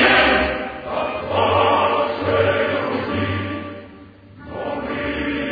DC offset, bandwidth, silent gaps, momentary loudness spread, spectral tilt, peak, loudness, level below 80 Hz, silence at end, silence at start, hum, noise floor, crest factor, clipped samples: under 0.1%; 5 kHz; none; 13 LU; -7.5 dB/octave; -4 dBFS; -20 LUFS; -42 dBFS; 0 s; 0 s; none; -42 dBFS; 16 dB; under 0.1%